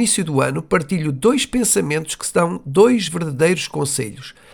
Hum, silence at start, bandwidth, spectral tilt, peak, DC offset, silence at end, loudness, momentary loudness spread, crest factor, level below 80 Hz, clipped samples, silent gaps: none; 0 s; 19 kHz; -4 dB/octave; -2 dBFS; 0.1%; 0.2 s; -18 LUFS; 7 LU; 16 dB; -48 dBFS; under 0.1%; none